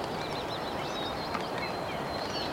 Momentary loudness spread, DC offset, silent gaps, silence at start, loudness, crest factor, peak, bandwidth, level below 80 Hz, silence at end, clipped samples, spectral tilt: 1 LU; under 0.1%; none; 0 s; -34 LUFS; 16 dB; -18 dBFS; 16.5 kHz; -56 dBFS; 0 s; under 0.1%; -4.5 dB/octave